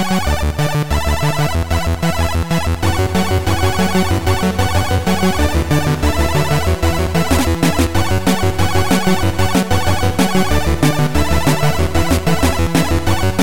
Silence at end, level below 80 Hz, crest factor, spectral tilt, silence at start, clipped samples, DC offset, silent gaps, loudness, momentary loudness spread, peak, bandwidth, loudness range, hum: 0 s; -24 dBFS; 12 dB; -5.5 dB/octave; 0 s; under 0.1%; 7%; none; -16 LUFS; 3 LU; -2 dBFS; 17 kHz; 1 LU; none